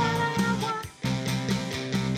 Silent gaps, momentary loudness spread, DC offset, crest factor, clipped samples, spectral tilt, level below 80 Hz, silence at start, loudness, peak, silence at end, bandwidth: none; 5 LU; under 0.1%; 14 dB; under 0.1%; -5 dB/octave; -50 dBFS; 0 s; -28 LUFS; -14 dBFS; 0 s; 15.5 kHz